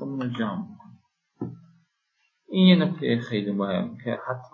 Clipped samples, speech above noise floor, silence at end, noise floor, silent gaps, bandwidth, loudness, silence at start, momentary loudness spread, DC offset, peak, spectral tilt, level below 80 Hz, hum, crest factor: under 0.1%; 49 dB; 0.05 s; -73 dBFS; none; 4.6 kHz; -24 LUFS; 0 s; 20 LU; under 0.1%; -4 dBFS; -8.5 dB/octave; -68 dBFS; none; 22 dB